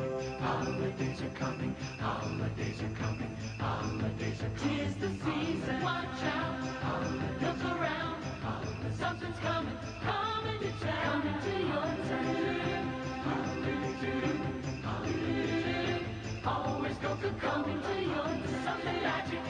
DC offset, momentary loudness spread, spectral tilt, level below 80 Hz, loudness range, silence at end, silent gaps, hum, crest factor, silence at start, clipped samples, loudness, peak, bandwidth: under 0.1%; 4 LU; -6 dB/octave; -54 dBFS; 2 LU; 0 s; none; none; 14 dB; 0 s; under 0.1%; -35 LUFS; -20 dBFS; 10 kHz